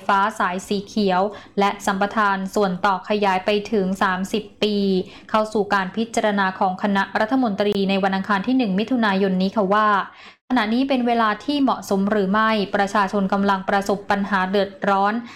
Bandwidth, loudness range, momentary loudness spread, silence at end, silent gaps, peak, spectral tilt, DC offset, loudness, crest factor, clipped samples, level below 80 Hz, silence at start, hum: 14.5 kHz; 2 LU; 4 LU; 0 s; 10.41-10.48 s; -8 dBFS; -5.5 dB/octave; 0.2%; -20 LUFS; 12 dB; under 0.1%; -56 dBFS; 0 s; none